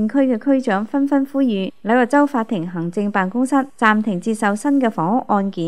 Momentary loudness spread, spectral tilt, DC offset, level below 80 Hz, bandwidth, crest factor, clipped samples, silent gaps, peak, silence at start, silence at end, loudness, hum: 6 LU; -6.5 dB/octave; 0.7%; -68 dBFS; 12 kHz; 18 dB; under 0.1%; none; 0 dBFS; 0 s; 0 s; -18 LUFS; none